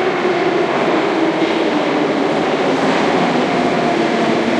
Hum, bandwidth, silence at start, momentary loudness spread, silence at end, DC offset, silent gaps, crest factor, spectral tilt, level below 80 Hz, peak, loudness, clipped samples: none; 10.5 kHz; 0 s; 1 LU; 0 s; under 0.1%; none; 12 dB; -5.5 dB/octave; -56 dBFS; -4 dBFS; -15 LUFS; under 0.1%